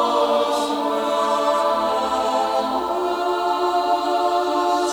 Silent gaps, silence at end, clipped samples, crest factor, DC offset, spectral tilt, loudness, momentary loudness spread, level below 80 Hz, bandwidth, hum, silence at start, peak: none; 0 s; under 0.1%; 12 dB; under 0.1%; -3 dB/octave; -20 LUFS; 3 LU; -56 dBFS; over 20 kHz; none; 0 s; -8 dBFS